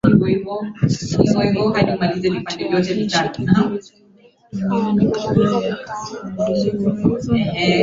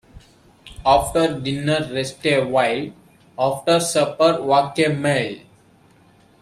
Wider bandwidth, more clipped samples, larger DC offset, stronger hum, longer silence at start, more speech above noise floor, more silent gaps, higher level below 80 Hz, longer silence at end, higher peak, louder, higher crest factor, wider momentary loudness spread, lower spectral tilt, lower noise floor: second, 7.8 kHz vs 15 kHz; neither; neither; neither; about the same, 0.05 s vs 0.15 s; second, 27 dB vs 34 dB; neither; about the same, -44 dBFS vs -46 dBFS; second, 0 s vs 1.05 s; about the same, 0 dBFS vs -2 dBFS; about the same, -19 LUFS vs -19 LUFS; about the same, 18 dB vs 18 dB; about the same, 9 LU vs 9 LU; first, -6.5 dB/octave vs -4.5 dB/octave; second, -45 dBFS vs -53 dBFS